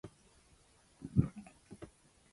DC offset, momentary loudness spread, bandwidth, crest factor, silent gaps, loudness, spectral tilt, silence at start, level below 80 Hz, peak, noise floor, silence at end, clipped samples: under 0.1%; 22 LU; 11.5 kHz; 28 dB; none; -36 LUFS; -8.5 dB/octave; 0.05 s; -56 dBFS; -14 dBFS; -67 dBFS; 0.45 s; under 0.1%